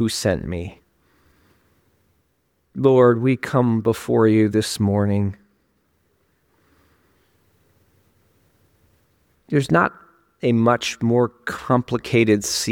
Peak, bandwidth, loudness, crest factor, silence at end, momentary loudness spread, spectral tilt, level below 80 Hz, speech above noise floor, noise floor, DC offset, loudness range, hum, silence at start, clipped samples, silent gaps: -2 dBFS; 17.5 kHz; -19 LUFS; 20 dB; 0 s; 10 LU; -5.5 dB/octave; -52 dBFS; 49 dB; -68 dBFS; under 0.1%; 8 LU; none; 0 s; under 0.1%; none